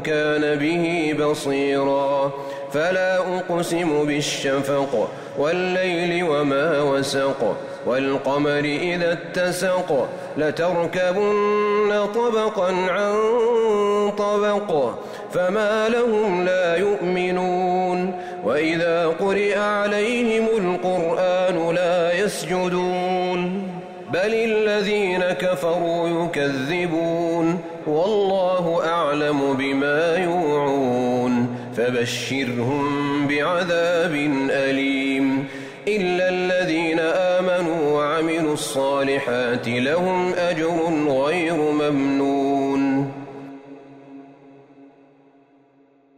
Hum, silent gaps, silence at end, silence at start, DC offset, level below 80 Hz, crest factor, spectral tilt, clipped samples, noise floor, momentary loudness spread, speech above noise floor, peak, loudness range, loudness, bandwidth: none; none; 1.3 s; 0 s; under 0.1%; -58 dBFS; 10 dB; -5.5 dB/octave; under 0.1%; -56 dBFS; 4 LU; 36 dB; -10 dBFS; 2 LU; -21 LUFS; 16 kHz